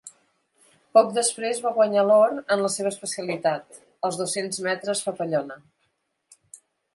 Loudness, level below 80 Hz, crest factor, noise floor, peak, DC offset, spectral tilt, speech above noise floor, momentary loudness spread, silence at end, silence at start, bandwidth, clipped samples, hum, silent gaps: -23 LUFS; -78 dBFS; 20 dB; -73 dBFS; -4 dBFS; under 0.1%; -3 dB/octave; 50 dB; 11 LU; 0.4 s; 0.05 s; 11.5 kHz; under 0.1%; none; none